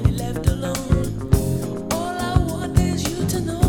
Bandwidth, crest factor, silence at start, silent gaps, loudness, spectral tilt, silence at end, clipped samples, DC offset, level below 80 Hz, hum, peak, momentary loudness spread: 19.5 kHz; 18 dB; 0 s; none; -22 LUFS; -6 dB/octave; 0 s; under 0.1%; under 0.1%; -28 dBFS; none; -2 dBFS; 4 LU